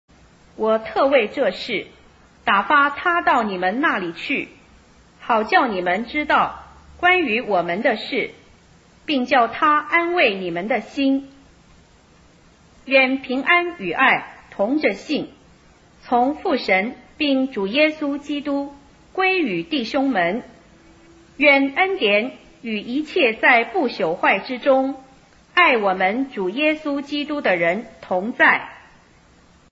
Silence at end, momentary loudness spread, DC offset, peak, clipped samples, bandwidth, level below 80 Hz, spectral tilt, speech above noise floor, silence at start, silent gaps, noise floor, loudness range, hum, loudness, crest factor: 0.9 s; 11 LU; under 0.1%; -2 dBFS; under 0.1%; 7.8 kHz; -56 dBFS; -5.5 dB/octave; 33 dB; 0.6 s; none; -52 dBFS; 3 LU; none; -19 LUFS; 20 dB